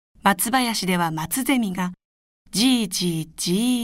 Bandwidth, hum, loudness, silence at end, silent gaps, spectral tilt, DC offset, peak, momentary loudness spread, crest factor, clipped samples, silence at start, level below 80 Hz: 16 kHz; none; -22 LUFS; 0 s; 2.05-2.45 s; -3.5 dB/octave; under 0.1%; -6 dBFS; 7 LU; 18 dB; under 0.1%; 0.25 s; -54 dBFS